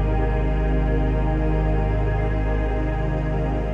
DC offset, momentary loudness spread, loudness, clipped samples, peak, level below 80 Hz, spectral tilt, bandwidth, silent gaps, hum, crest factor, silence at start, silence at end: under 0.1%; 2 LU; -23 LUFS; under 0.1%; -10 dBFS; -22 dBFS; -9.5 dB/octave; 3.6 kHz; none; none; 10 dB; 0 s; 0 s